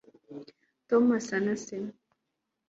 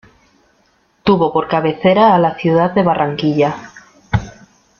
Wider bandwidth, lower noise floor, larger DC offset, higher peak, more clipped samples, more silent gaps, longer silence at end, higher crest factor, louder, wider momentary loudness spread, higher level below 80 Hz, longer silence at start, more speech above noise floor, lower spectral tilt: first, 8 kHz vs 7 kHz; first, -83 dBFS vs -57 dBFS; neither; second, -12 dBFS vs 0 dBFS; neither; neither; first, 0.8 s vs 0.5 s; about the same, 18 dB vs 14 dB; second, -28 LUFS vs -14 LUFS; first, 22 LU vs 10 LU; second, -74 dBFS vs -42 dBFS; second, 0.3 s vs 1.05 s; first, 56 dB vs 44 dB; second, -5.5 dB/octave vs -7.5 dB/octave